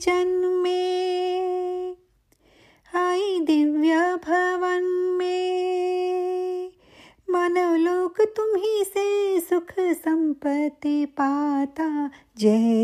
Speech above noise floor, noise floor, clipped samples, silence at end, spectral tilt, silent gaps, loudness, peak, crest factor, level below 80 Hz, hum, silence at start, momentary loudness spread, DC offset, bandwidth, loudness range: 39 dB; -62 dBFS; under 0.1%; 0 s; -5 dB/octave; none; -23 LUFS; -8 dBFS; 16 dB; -66 dBFS; none; 0 s; 7 LU; under 0.1%; 15 kHz; 3 LU